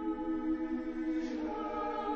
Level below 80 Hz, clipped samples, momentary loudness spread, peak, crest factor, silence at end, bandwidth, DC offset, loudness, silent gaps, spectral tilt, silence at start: -56 dBFS; under 0.1%; 2 LU; -24 dBFS; 12 dB; 0 s; 7 kHz; under 0.1%; -36 LUFS; none; -6.5 dB/octave; 0 s